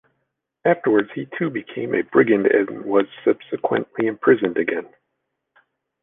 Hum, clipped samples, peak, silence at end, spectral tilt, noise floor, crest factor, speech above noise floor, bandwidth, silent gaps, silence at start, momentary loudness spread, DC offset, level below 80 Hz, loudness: none; under 0.1%; -2 dBFS; 1.2 s; -9.5 dB/octave; -77 dBFS; 18 dB; 57 dB; 3.9 kHz; none; 0.65 s; 9 LU; under 0.1%; -66 dBFS; -20 LUFS